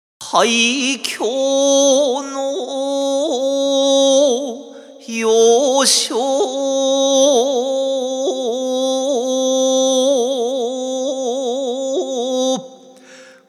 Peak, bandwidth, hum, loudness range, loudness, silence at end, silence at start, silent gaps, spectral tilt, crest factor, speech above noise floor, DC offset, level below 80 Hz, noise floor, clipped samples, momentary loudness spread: 0 dBFS; 14.5 kHz; none; 3 LU; -16 LUFS; 0.25 s; 0.2 s; none; -1 dB/octave; 16 dB; 26 dB; under 0.1%; -80 dBFS; -42 dBFS; under 0.1%; 9 LU